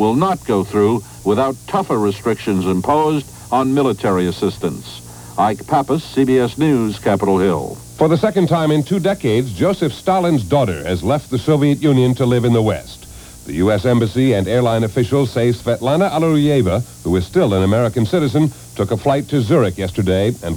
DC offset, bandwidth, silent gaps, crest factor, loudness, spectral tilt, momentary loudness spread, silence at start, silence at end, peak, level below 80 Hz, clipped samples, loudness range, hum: under 0.1%; over 20 kHz; none; 14 dB; -16 LUFS; -7 dB/octave; 6 LU; 0 s; 0 s; -2 dBFS; -42 dBFS; under 0.1%; 2 LU; none